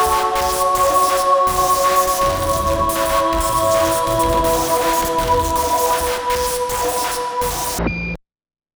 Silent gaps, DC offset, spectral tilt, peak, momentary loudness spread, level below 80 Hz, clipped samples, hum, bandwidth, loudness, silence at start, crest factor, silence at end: none; under 0.1%; -3 dB/octave; -4 dBFS; 6 LU; -32 dBFS; under 0.1%; none; over 20 kHz; -17 LUFS; 0 s; 14 dB; 0.6 s